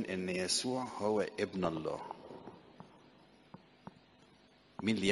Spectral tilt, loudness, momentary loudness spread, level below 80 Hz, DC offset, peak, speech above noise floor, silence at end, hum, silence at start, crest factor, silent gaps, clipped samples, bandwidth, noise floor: -4 dB/octave; -36 LUFS; 24 LU; -70 dBFS; under 0.1%; -16 dBFS; 29 dB; 0 s; none; 0 s; 22 dB; none; under 0.1%; 11.5 kHz; -64 dBFS